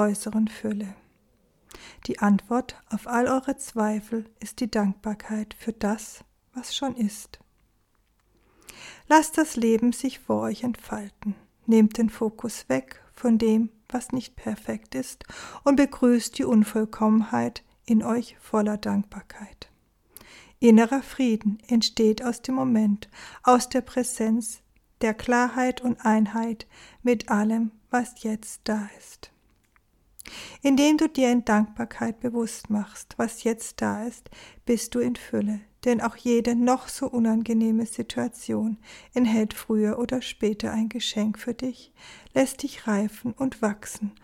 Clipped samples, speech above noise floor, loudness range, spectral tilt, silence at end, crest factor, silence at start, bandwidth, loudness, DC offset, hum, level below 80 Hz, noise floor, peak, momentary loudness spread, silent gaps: under 0.1%; 42 dB; 5 LU; -5 dB/octave; 0.1 s; 20 dB; 0 s; 15.5 kHz; -25 LUFS; under 0.1%; none; -56 dBFS; -67 dBFS; -4 dBFS; 14 LU; none